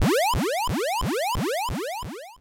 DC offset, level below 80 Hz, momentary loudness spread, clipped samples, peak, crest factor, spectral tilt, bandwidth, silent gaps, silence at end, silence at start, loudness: under 0.1%; -38 dBFS; 10 LU; under 0.1%; -18 dBFS; 8 dB; -4.5 dB/octave; 17 kHz; none; 0.05 s; 0 s; -25 LUFS